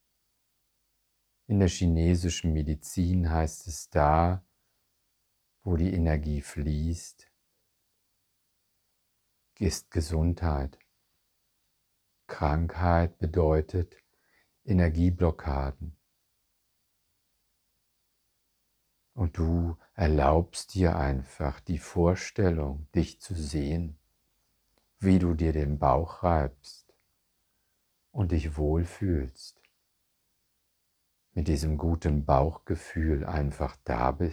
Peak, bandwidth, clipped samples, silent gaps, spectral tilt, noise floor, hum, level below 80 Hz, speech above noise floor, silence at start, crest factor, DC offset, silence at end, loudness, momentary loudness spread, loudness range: -8 dBFS; 13 kHz; under 0.1%; none; -7 dB/octave; -76 dBFS; none; -38 dBFS; 49 dB; 1.5 s; 22 dB; under 0.1%; 0 s; -29 LUFS; 11 LU; 7 LU